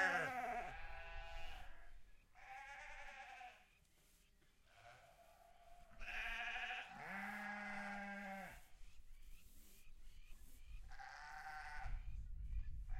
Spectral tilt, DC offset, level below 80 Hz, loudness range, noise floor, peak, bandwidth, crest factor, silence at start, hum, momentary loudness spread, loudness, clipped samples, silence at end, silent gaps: -4 dB/octave; under 0.1%; -56 dBFS; 11 LU; -72 dBFS; -26 dBFS; 16 kHz; 24 dB; 0 s; none; 22 LU; -50 LUFS; under 0.1%; 0 s; none